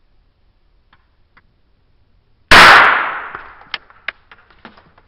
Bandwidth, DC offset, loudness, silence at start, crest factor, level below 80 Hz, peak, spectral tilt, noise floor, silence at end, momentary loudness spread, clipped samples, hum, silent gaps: over 20 kHz; under 0.1%; -6 LUFS; 2.5 s; 16 dB; -36 dBFS; 0 dBFS; -2 dB/octave; -55 dBFS; 1.8 s; 26 LU; 0.7%; none; none